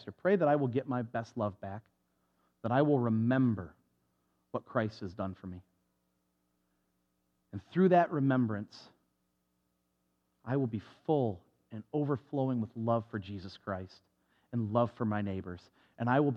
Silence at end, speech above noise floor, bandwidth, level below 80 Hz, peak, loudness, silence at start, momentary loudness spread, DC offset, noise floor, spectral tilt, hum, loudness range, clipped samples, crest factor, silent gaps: 0 s; 47 dB; 7 kHz; -76 dBFS; -14 dBFS; -33 LUFS; 0 s; 20 LU; under 0.1%; -79 dBFS; -9.5 dB/octave; none; 8 LU; under 0.1%; 20 dB; none